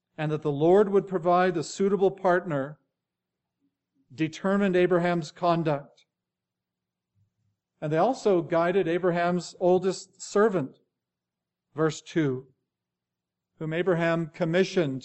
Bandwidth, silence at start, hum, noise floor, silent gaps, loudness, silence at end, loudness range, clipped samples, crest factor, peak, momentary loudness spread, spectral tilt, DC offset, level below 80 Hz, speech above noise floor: 8.2 kHz; 0.2 s; 60 Hz at -55 dBFS; -88 dBFS; none; -26 LUFS; 0.05 s; 5 LU; under 0.1%; 18 dB; -10 dBFS; 9 LU; -6.5 dB/octave; under 0.1%; -70 dBFS; 63 dB